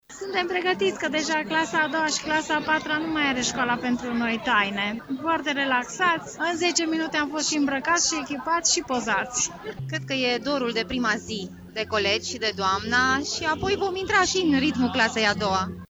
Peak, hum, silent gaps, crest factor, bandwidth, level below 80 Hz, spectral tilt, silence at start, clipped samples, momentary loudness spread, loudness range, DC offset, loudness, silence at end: -6 dBFS; none; none; 18 dB; over 20 kHz; -54 dBFS; -2.5 dB/octave; 0.1 s; under 0.1%; 6 LU; 2 LU; under 0.1%; -24 LUFS; 0.05 s